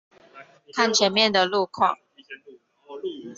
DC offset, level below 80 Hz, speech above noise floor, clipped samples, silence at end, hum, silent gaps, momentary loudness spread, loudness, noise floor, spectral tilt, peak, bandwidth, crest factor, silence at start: under 0.1%; -72 dBFS; 30 dB; under 0.1%; 0.05 s; none; none; 25 LU; -21 LUFS; -52 dBFS; -2.5 dB/octave; -6 dBFS; 8 kHz; 20 dB; 0.35 s